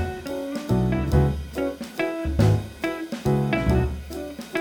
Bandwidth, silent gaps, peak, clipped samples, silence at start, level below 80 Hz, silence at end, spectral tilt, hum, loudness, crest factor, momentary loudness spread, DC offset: 18.5 kHz; none; -6 dBFS; under 0.1%; 0 s; -32 dBFS; 0 s; -7.5 dB/octave; none; -25 LUFS; 18 dB; 9 LU; under 0.1%